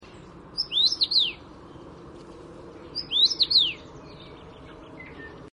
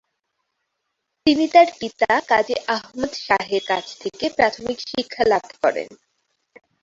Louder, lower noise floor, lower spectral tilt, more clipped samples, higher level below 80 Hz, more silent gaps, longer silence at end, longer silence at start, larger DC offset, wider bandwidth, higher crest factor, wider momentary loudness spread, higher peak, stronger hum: about the same, -21 LUFS vs -20 LUFS; second, -46 dBFS vs -77 dBFS; second, -1.5 dB/octave vs -3.5 dB/octave; neither; about the same, -56 dBFS vs -58 dBFS; neither; second, 0.05 s vs 0.9 s; second, 0.05 s vs 1.25 s; neither; first, 11.5 kHz vs 7.8 kHz; about the same, 20 dB vs 20 dB; first, 26 LU vs 12 LU; second, -8 dBFS vs -2 dBFS; neither